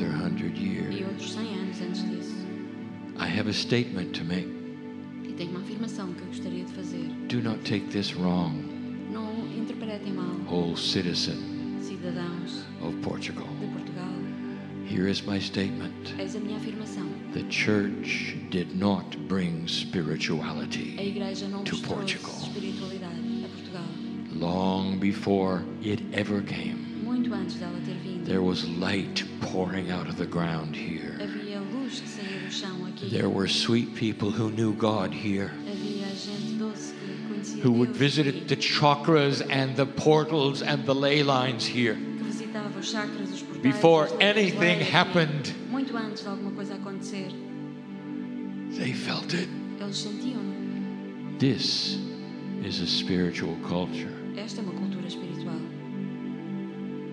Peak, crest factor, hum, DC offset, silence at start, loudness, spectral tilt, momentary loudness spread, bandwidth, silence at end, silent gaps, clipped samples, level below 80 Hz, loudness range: -2 dBFS; 26 dB; none; under 0.1%; 0 s; -29 LUFS; -5.5 dB/octave; 12 LU; 11 kHz; 0 s; none; under 0.1%; -66 dBFS; 9 LU